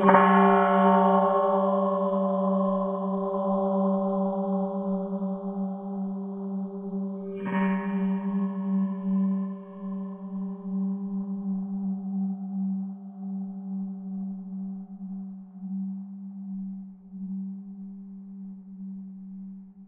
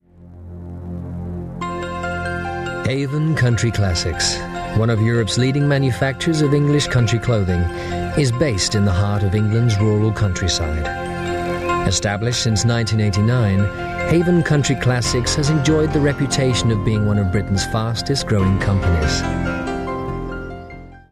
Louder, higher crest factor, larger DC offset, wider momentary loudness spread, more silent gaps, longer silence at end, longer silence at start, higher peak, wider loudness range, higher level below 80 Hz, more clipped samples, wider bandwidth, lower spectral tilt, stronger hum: second, -27 LUFS vs -19 LUFS; first, 22 dB vs 12 dB; neither; first, 19 LU vs 10 LU; neither; second, 0 s vs 0.15 s; second, 0 s vs 0.2 s; about the same, -6 dBFS vs -6 dBFS; first, 13 LU vs 3 LU; second, -70 dBFS vs -34 dBFS; neither; second, 3.6 kHz vs 13 kHz; first, -10.5 dB/octave vs -5.5 dB/octave; neither